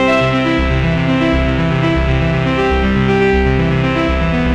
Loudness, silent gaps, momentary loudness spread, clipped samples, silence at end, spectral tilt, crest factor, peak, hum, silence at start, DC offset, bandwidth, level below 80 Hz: -14 LUFS; none; 2 LU; under 0.1%; 0 s; -7.5 dB/octave; 12 dB; -2 dBFS; none; 0 s; under 0.1%; 8.8 kHz; -22 dBFS